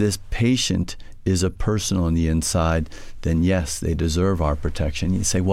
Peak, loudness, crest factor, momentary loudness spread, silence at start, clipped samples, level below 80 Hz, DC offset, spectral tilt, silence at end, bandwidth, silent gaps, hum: -8 dBFS; -22 LUFS; 14 dB; 5 LU; 0 s; under 0.1%; -30 dBFS; under 0.1%; -5 dB/octave; 0 s; 15.5 kHz; none; none